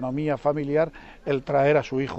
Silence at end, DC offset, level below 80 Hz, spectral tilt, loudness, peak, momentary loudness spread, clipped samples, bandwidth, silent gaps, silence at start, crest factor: 0 s; under 0.1%; -52 dBFS; -7.5 dB/octave; -24 LUFS; -10 dBFS; 8 LU; under 0.1%; 8.2 kHz; none; 0 s; 14 dB